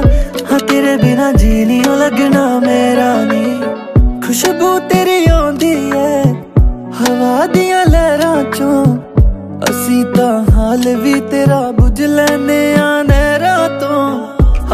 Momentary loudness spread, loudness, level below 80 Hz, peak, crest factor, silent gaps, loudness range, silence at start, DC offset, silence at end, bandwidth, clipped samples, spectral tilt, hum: 4 LU; -12 LUFS; -18 dBFS; 0 dBFS; 10 dB; none; 1 LU; 0 s; under 0.1%; 0 s; 15.5 kHz; under 0.1%; -6 dB/octave; none